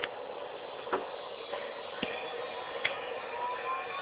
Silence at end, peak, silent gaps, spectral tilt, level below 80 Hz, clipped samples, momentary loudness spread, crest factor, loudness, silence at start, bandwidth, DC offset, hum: 0 s; -14 dBFS; none; 0 dB/octave; -72 dBFS; under 0.1%; 7 LU; 24 dB; -37 LUFS; 0 s; 5.2 kHz; under 0.1%; none